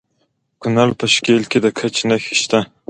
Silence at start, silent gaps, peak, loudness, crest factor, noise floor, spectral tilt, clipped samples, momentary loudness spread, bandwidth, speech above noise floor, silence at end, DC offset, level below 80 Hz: 0.6 s; none; 0 dBFS; -16 LUFS; 18 dB; -66 dBFS; -4 dB/octave; under 0.1%; 5 LU; 9.6 kHz; 50 dB; 0.25 s; under 0.1%; -56 dBFS